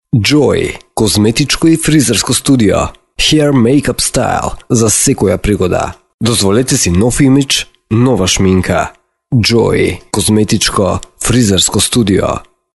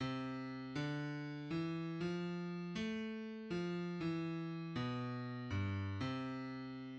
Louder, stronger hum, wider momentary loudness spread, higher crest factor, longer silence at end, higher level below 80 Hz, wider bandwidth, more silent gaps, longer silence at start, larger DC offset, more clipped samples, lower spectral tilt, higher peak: first, -11 LUFS vs -43 LUFS; neither; first, 7 LU vs 4 LU; about the same, 10 dB vs 14 dB; first, 0.35 s vs 0 s; first, -30 dBFS vs -70 dBFS; first, 12 kHz vs 8.4 kHz; first, 6.14-6.19 s vs none; first, 0.15 s vs 0 s; neither; neither; second, -4.5 dB/octave vs -7 dB/octave; first, 0 dBFS vs -28 dBFS